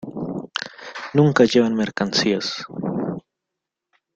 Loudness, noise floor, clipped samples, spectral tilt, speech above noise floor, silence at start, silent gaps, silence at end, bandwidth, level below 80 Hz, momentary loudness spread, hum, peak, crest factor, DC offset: -21 LUFS; -83 dBFS; under 0.1%; -5.5 dB/octave; 65 dB; 0 s; none; 0.95 s; 8.2 kHz; -60 dBFS; 14 LU; none; -2 dBFS; 20 dB; under 0.1%